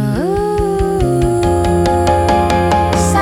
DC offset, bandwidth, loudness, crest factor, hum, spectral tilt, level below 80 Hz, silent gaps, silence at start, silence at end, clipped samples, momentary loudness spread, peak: under 0.1%; 16 kHz; -14 LUFS; 12 dB; none; -6 dB/octave; -26 dBFS; none; 0 s; 0 s; under 0.1%; 3 LU; 0 dBFS